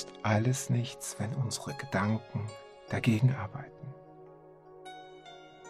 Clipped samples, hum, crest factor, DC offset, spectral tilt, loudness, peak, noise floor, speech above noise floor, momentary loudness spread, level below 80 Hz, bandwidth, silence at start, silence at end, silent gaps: under 0.1%; none; 20 dB; under 0.1%; -5.5 dB/octave; -32 LUFS; -12 dBFS; -54 dBFS; 22 dB; 22 LU; -66 dBFS; 14.5 kHz; 0 s; 0 s; none